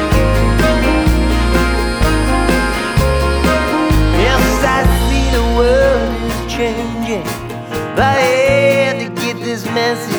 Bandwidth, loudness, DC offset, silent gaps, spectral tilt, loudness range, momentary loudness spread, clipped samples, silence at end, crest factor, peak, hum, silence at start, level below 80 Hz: over 20 kHz; -14 LUFS; under 0.1%; none; -5.5 dB/octave; 2 LU; 8 LU; under 0.1%; 0 s; 12 dB; 0 dBFS; none; 0 s; -18 dBFS